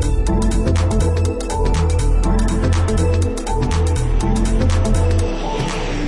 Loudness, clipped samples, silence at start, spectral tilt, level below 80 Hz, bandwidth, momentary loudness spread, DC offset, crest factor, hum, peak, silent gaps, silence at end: -18 LUFS; under 0.1%; 0 s; -6 dB/octave; -20 dBFS; 11.5 kHz; 4 LU; under 0.1%; 12 dB; none; -4 dBFS; none; 0 s